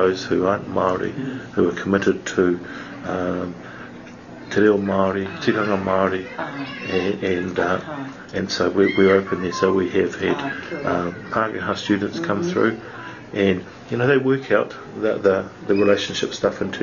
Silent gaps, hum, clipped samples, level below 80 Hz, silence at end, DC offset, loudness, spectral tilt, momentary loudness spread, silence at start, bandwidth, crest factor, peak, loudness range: none; none; under 0.1%; -56 dBFS; 0 s; under 0.1%; -21 LUFS; -6 dB/octave; 12 LU; 0 s; 7.4 kHz; 18 dB; -4 dBFS; 3 LU